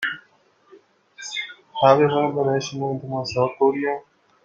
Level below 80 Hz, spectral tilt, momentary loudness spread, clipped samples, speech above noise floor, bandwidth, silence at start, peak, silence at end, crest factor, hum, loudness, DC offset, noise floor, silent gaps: -64 dBFS; -5.5 dB/octave; 15 LU; under 0.1%; 39 dB; 7.6 kHz; 0 s; -2 dBFS; 0.45 s; 20 dB; none; -22 LUFS; under 0.1%; -59 dBFS; none